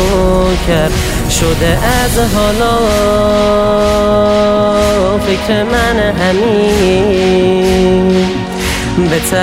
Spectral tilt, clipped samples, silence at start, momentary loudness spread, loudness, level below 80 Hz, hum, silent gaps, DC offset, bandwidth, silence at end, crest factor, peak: -5 dB/octave; under 0.1%; 0 s; 3 LU; -11 LUFS; -22 dBFS; none; none; under 0.1%; 16.5 kHz; 0 s; 10 dB; 0 dBFS